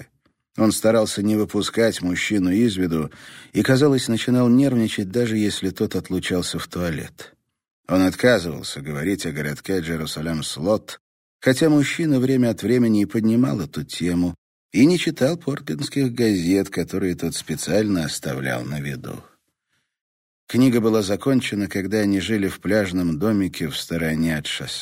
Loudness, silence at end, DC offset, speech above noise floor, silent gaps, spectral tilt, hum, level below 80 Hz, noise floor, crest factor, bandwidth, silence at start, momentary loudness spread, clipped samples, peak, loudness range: -21 LUFS; 0 s; under 0.1%; 52 dB; 7.71-7.84 s, 11.00-11.39 s, 14.38-14.69 s, 20.01-20.47 s; -5.5 dB/octave; none; -50 dBFS; -73 dBFS; 18 dB; 16 kHz; 0 s; 10 LU; under 0.1%; -4 dBFS; 5 LU